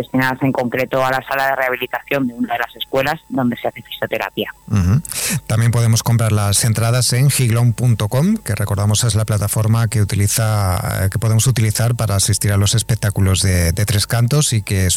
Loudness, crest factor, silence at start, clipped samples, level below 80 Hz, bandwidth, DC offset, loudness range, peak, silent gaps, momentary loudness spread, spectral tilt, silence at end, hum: -16 LUFS; 10 dB; 0 s; under 0.1%; -42 dBFS; 19 kHz; under 0.1%; 4 LU; -6 dBFS; none; 6 LU; -4.5 dB/octave; 0 s; none